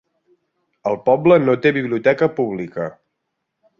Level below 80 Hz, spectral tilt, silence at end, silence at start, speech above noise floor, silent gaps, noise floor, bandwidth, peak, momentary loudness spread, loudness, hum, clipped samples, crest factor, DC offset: -60 dBFS; -8.5 dB/octave; 0.9 s; 0.85 s; 59 dB; none; -76 dBFS; 6.8 kHz; -2 dBFS; 14 LU; -18 LUFS; none; under 0.1%; 18 dB; under 0.1%